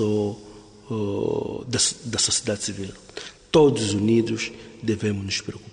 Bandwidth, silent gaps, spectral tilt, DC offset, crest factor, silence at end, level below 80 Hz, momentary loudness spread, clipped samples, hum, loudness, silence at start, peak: 10.5 kHz; none; -4 dB/octave; under 0.1%; 18 dB; 0 s; -54 dBFS; 16 LU; under 0.1%; none; -23 LUFS; 0 s; -6 dBFS